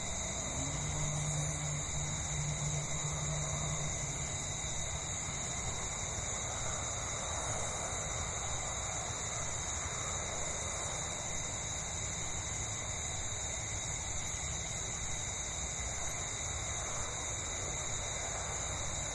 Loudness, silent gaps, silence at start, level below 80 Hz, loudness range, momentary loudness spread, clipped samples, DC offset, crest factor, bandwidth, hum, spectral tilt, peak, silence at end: -36 LUFS; none; 0 s; -48 dBFS; 1 LU; 2 LU; under 0.1%; under 0.1%; 14 dB; 12 kHz; none; -2.5 dB/octave; -24 dBFS; 0 s